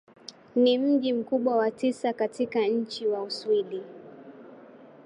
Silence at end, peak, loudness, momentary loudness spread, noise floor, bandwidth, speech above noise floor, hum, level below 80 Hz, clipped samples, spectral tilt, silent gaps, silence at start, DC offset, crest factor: 0.2 s; -12 dBFS; -26 LUFS; 23 LU; -50 dBFS; 11 kHz; 24 dB; none; -80 dBFS; under 0.1%; -5 dB/octave; none; 0.3 s; under 0.1%; 16 dB